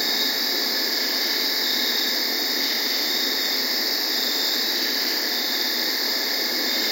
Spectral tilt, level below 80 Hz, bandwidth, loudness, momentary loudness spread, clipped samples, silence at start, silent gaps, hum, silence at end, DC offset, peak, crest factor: 1 dB/octave; under -90 dBFS; 16.5 kHz; -20 LUFS; 1 LU; under 0.1%; 0 s; none; none; 0 s; under 0.1%; -8 dBFS; 14 dB